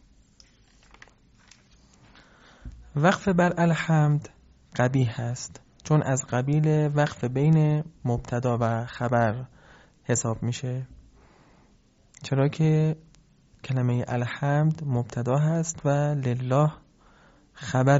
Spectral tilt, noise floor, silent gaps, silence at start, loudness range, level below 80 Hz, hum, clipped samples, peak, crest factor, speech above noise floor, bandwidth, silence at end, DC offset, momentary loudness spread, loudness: -7 dB/octave; -60 dBFS; none; 2.65 s; 5 LU; -54 dBFS; none; under 0.1%; -6 dBFS; 20 dB; 36 dB; 8 kHz; 0 s; under 0.1%; 14 LU; -25 LUFS